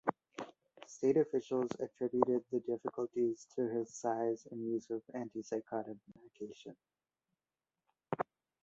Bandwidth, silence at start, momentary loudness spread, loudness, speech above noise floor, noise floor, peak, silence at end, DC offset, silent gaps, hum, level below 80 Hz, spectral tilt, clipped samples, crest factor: 8 kHz; 0.05 s; 16 LU; -38 LUFS; over 53 dB; under -90 dBFS; -12 dBFS; 0.4 s; under 0.1%; none; none; -80 dBFS; -6.5 dB/octave; under 0.1%; 26 dB